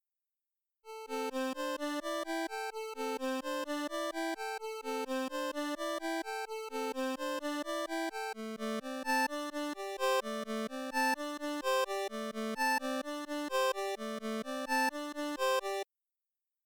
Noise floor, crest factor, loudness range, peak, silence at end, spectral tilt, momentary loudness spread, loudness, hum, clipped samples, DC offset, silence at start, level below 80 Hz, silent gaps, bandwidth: under -90 dBFS; 14 dB; 3 LU; -22 dBFS; 0.8 s; -2.5 dB/octave; 7 LU; -36 LUFS; none; under 0.1%; under 0.1%; 0.85 s; -76 dBFS; none; 19.5 kHz